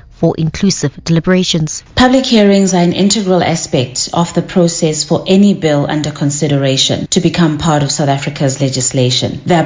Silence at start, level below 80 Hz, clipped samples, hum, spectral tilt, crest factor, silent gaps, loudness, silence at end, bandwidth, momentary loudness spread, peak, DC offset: 0.2 s; -38 dBFS; 0.2%; none; -5 dB/octave; 12 dB; none; -12 LUFS; 0 s; 8 kHz; 6 LU; 0 dBFS; under 0.1%